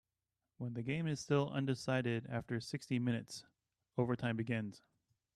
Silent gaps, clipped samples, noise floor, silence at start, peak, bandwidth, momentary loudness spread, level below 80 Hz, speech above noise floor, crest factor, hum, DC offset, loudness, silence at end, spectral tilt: none; under 0.1%; under -90 dBFS; 0.6 s; -20 dBFS; 12.5 kHz; 10 LU; -72 dBFS; over 52 dB; 18 dB; none; under 0.1%; -39 LUFS; 0.6 s; -6.5 dB/octave